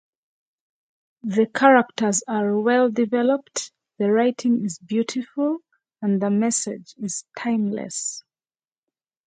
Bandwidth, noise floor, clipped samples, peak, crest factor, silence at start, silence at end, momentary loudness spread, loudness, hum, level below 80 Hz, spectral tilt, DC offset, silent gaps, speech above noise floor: 9.6 kHz; under -90 dBFS; under 0.1%; 0 dBFS; 22 dB; 1.25 s; 1.05 s; 13 LU; -22 LUFS; none; -74 dBFS; -4.5 dB/octave; under 0.1%; none; over 69 dB